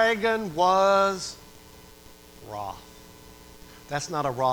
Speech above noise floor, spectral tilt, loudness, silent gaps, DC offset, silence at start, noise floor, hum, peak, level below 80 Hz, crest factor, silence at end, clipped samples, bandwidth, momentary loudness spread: 25 dB; -4 dB/octave; -25 LUFS; none; under 0.1%; 0 s; -49 dBFS; none; -10 dBFS; -56 dBFS; 18 dB; 0 s; under 0.1%; over 20 kHz; 24 LU